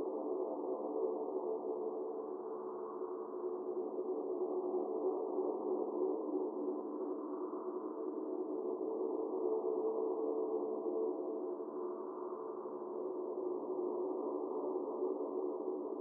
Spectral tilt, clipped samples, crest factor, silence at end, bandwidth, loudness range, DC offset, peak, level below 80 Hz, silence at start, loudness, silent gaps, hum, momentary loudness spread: 5 dB/octave; under 0.1%; 14 dB; 0 s; 1.6 kHz; 3 LU; under 0.1%; -26 dBFS; under -90 dBFS; 0 s; -40 LUFS; none; none; 6 LU